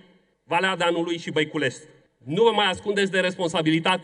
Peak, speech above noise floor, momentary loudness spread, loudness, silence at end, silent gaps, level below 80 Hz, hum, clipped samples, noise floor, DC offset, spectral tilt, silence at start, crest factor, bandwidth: -6 dBFS; 34 dB; 7 LU; -23 LUFS; 0 s; none; -68 dBFS; none; under 0.1%; -57 dBFS; under 0.1%; -4.5 dB/octave; 0.5 s; 18 dB; 10.5 kHz